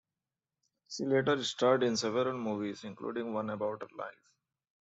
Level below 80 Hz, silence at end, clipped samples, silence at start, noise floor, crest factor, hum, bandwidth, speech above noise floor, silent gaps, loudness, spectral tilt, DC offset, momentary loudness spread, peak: -78 dBFS; 0.7 s; under 0.1%; 0.9 s; under -90 dBFS; 20 dB; none; 8.2 kHz; over 57 dB; none; -33 LUFS; -4.5 dB/octave; under 0.1%; 14 LU; -14 dBFS